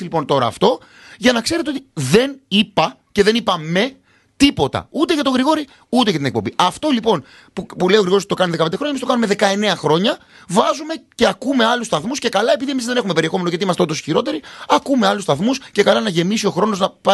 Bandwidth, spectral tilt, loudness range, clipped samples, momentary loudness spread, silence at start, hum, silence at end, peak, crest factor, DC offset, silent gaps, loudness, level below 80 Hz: 12.5 kHz; -4.5 dB/octave; 1 LU; under 0.1%; 6 LU; 0 s; none; 0 s; 0 dBFS; 18 dB; under 0.1%; none; -17 LUFS; -50 dBFS